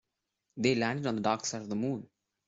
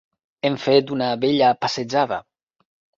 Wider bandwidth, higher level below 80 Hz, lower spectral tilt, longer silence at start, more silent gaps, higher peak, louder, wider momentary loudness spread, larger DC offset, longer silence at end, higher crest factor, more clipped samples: about the same, 7.8 kHz vs 7.6 kHz; second, -70 dBFS vs -62 dBFS; about the same, -4.5 dB/octave vs -5.5 dB/octave; about the same, 0.55 s vs 0.45 s; neither; second, -14 dBFS vs -4 dBFS; second, -32 LUFS vs -20 LUFS; about the same, 9 LU vs 7 LU; neither; second, 0.4 s vs 0.75 s; about the same, 20 dB vs 18 dB; neither